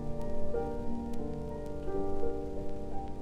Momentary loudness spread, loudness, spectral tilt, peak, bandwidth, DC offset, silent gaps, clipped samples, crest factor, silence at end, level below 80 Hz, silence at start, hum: 5 LU; -38 LUFS; -8.5 dB/octave; -18 dBFS; 4.2 kHz; under 0.1%; none; under 0.1%; 14 dB; 0 s; -40 dBFS; 0 s; none